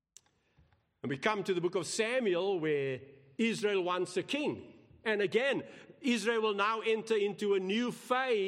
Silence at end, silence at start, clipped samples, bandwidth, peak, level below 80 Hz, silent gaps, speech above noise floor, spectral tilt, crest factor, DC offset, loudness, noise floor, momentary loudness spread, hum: 0 s; 1.05 s; under 0.1%; 13.5 kHz; -16 dBFS; -80 dBFS; none; 37 dB; -4 dB/octave; 18 dB; under 0.1%; -33 LUFS; -69 dBFS; 8 LU; none